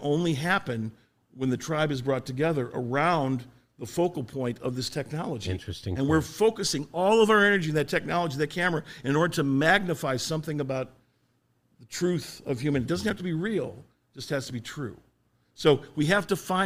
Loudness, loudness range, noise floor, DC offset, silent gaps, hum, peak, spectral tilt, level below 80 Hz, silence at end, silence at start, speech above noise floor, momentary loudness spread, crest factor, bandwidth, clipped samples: -27 LUFS; 7 LU; -70 dBFS; under 0.1%; none; none; -6 dBFS; -5 dB/octave; -56 dBFS; 0 s; 0 s; 43 dB; 12 LU; 22 dB; 16 kHz; under 0.1%